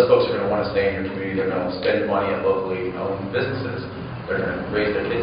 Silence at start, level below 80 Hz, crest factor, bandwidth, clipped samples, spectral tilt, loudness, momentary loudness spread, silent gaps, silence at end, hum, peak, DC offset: 0 s; -48 dBFS; 18 dB; 5.2 kHz; under 0.1%; -4.5 dB/octave; -23 LUFS; 6 LU; none; 0 s; none; -4 dBFS; under 0.1%